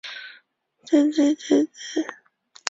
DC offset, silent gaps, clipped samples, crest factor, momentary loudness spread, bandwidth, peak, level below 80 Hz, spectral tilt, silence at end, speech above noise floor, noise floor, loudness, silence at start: under 0.1%; none; under 0.1%; 24 dB; 17 LU; 7.8 kHz; 0 dBFS; -72 dBFS; -3 dB/octave; 0.55 s; 39 dB; -60 dBFS; -22 LUFS; 0.05 s